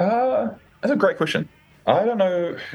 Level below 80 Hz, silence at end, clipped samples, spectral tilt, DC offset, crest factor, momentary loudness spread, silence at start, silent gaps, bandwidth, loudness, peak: -64 dBFS; 0 s; under 0.1%; -6.5 dB/octave; under 0.1%; 18 dB; 9 LU; 0 s; none; 12 kHz; -22 LUFS; -4 dBFS